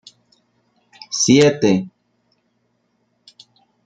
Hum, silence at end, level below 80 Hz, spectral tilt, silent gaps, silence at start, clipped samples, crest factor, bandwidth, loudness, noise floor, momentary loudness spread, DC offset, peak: 60 Hz at -45 dBFS; 1.95 s; -62 dBFS; -4.5 dB/octave; none; 1.1 s; under 0.1%; 20 dB; 9.4 kHz; -15 LUFS; -67 dBFS; 14 LU; under 0.1%; -2 dBFS